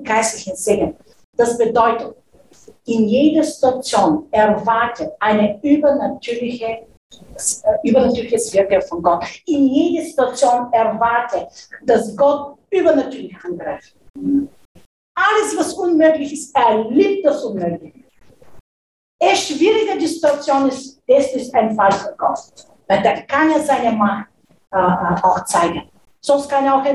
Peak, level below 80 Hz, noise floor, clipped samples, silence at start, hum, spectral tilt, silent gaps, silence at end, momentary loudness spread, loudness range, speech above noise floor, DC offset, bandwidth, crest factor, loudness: -2 dBFS; -50 dBFS; -47 dBFS; under 0.1%; 0 s; none; -4.5 dB/octave; 1.24-1.33 s, 6.97-7.10 s, 14.10-14.14 s, 14.65-14.75 s, 14.86-15.15 s, 18.60-19.19 s; 0 s; 11 LU; 3 LU; 31 dB; under 0.1%; 12.5 kHz; 16 dB; -17 LUFS